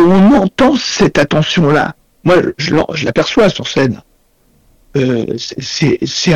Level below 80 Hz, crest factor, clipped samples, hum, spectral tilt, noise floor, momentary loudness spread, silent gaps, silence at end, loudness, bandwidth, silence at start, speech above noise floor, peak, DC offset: -38 dBFS; 8 dB; under 0.1%; none; -5.5 dB/octave; -53 dBFS; 10 LU; none; 0 s; -12 LUFS; 10.5 kHz; 0 s; 40 dB; -4 dBFS; under 0.1%